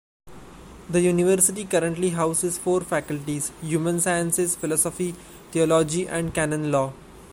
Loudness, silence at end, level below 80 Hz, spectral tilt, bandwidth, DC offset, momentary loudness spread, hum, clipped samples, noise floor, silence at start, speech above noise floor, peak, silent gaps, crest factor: -23 LUFS; 0 s; -52 dBFS; -4.5 dB/octave; 16.5 kHz; under 0.1%; 9 LU; none; under 0.1%; -44 dBFS; 0.25 s; 21 dB; -6 dBFS; none; 18 dB